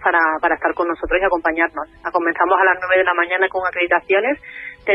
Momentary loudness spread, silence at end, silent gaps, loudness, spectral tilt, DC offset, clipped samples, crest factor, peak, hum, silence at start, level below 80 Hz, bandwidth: 8 LU; 0 s; none; -18 LUFS; -6.5 dB/octave; under 0.1%; under 0.1%; 14 dB; -4 dBFS; none; 0 s; -44 dBFS; 5.8 kHz